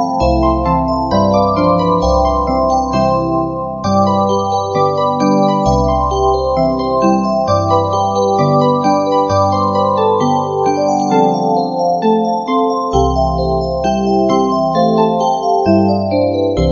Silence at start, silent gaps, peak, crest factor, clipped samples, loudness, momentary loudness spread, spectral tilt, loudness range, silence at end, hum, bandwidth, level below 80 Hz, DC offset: 0 s; none; 0 dBFS; 12 dB; under 0.1%; -14 LUFS; 3 LU; -7 dB/octave; 1 LU; 0 s; none; 7.4 kHz; -28 dBFS; 0.1%